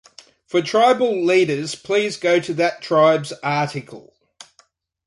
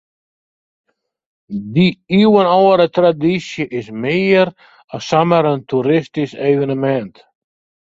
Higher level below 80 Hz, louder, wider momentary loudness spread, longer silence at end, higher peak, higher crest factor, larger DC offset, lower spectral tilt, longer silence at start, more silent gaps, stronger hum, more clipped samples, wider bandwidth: second, -66 dBFS vs -56 dBFS; second, -19 LUFS vs -15 LUFS; second, 7 LU vs 12 LU; first, 1.05 s vs 0.85 s; second, -4 dBFS vs 0 dBFS; about the same, 16 dB vs 16 dB; neither; second, -5 dB/octave vs -7 dB/octave; second, 0.55 s vs 1.5 s; second, none vs 4.84-4.88 s; neither; neither; first, 11.5 kHz vs 7.8 kHz